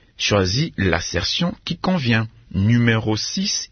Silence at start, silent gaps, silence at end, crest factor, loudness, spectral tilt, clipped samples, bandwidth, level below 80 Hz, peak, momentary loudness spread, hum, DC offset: 0.2 s; none; 0.05 s; 18 dB; -20 LUFS; -4.5 dB/octave; under 0.1%; 6.6 kHz; -44 dBFS; -2 dBFS; 5 LU; none; under 0.1%